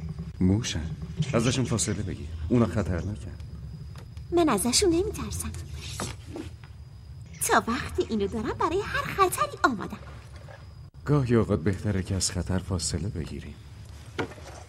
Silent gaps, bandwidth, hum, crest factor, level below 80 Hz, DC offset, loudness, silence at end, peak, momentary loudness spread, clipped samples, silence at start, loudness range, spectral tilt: none; 16 kHz; none; 20 dB; -42 dBFS; under 0.1%; -27 LUFS; 0 s; -8 dBFS; 21 LU; under 0.1%; 0 s; 3 LU; -5 dB/octave